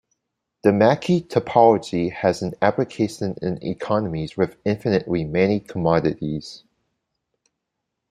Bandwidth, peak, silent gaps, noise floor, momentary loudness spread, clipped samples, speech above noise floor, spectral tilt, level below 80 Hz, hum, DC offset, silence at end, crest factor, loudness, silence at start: 12.5 kHz; -2 dBFS; none; -80 dBFS; 10 LU; under 0.1%; 60 dB; -7 dB/octave; -54 dBFS; none; under 0.1%; 1.55 s; 20 dB; -21 LUFS; 0.65 s